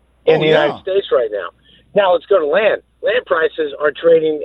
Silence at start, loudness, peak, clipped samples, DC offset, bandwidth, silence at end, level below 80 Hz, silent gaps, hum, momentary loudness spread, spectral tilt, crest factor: 0.25 s; -15 LUFS; 0 dBFS; under 0.1%; under 0.1%; 5.8 kHz; 0 s; -56 dBFS; none; none; 7 LU; -7 dB/octave; 16 dB